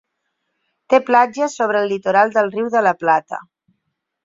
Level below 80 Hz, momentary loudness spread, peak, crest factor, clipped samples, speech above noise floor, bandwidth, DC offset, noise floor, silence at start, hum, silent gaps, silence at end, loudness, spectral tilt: -68 dBFS; 5 LU; -2 dBFS; 16 dB; under 0.1%; 58 dB; 7.8 kHz; under 0.1%; -74 dBFS; 0.9 s; none; none; 0.85 s; -17 LUFS; -4.5 dB/octave